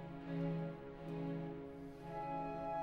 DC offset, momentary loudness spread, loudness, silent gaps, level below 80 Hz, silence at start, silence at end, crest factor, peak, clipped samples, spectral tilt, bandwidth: under 0.1%; 8 LU; -45 LUFS; none; -64 dBFS; 0 s; 0 s; 14 dB; -30 dBFS; under 0.1%; -9 dB/octave; 6.2 kHz